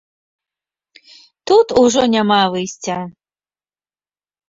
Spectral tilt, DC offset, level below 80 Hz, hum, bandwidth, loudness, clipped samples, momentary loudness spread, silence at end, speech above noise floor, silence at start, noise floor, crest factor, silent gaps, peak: -4 dB/octave; under 0.1%; -54 dBFS; 50 Hz at -55 dBFS; 7.8 kHz; -15 LUFS; under 0.1%; 14 LU; 1.4 s; over 76 dB; 1.45 s; under -90 dBFS; 16 dB; none; -2 dBFS